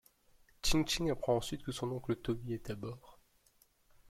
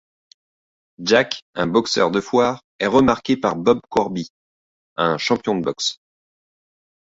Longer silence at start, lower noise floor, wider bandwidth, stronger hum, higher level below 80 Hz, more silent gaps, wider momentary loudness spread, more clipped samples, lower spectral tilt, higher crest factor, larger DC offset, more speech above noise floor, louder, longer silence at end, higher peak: second, 0.65 s vs 1 s; second, -70 dBFS vs under -90 dBFS; first, 16 kHz vs 8 kHz; neither; about the same, -50 dBFS vs -54 dBFS; second, none vs 1.42-1.53 s, 2.64-2.79 s, 4.30-4.96 s; first, 11 LU vs 8 LU; neither; about the same, -4.5 dB/octave vs -4.5 dB/octave; about the same, 20 dB vs 20 dB; neither; second, 34 dB vs over 71 dB; second, -37 LUFS vs -19 LUFS; second, 0.95 s vs 1.1 s; second, -18 dBFS vs -2 dBFS